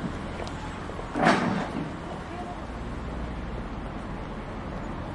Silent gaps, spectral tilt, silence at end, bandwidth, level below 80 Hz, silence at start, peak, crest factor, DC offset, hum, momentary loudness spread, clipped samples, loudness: none; -6 dB/octave; 0 s; 11.5 kHz; -40 dBFS; 0 s; -6 dBFS; 26 dB; under 0.1%; none; 12 LU; under 0.1%; -31 LUFS